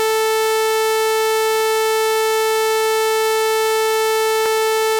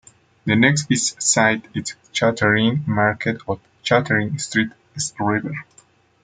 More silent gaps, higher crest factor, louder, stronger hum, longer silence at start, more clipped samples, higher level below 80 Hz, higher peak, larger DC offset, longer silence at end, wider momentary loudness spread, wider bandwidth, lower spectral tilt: neither; second, 8 dB vs 20 dB; first, -17 LUFS vs -20 LUFS; first, 60 Hz at -60 dBFS vs none; second, 0 s vs 0.45 s; neither; second, -64 dBFS vs -58 dBFS; second, -10 dBFS vs -2 dBFS; neither; second, 0 s vs 0.6 s; second, 0 LU vs 12 LU; first, 17 kHz vs 9.6 kHz; second, 0.5 dB/octave vs -4 dB/octave